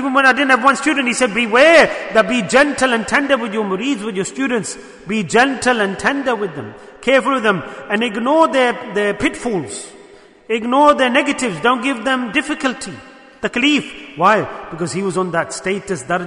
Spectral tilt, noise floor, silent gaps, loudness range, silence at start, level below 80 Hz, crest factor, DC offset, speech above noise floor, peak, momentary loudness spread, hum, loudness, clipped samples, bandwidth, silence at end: -4 dB/octave; -43 dBFS; none; 5 LU; 0 s; -50 dBFS; 16 dB; under 0.1%; 27 dB; 0 dBFS; 11 LU; none; -16 LUFS; under 0.1%; 11 kHz; 0 s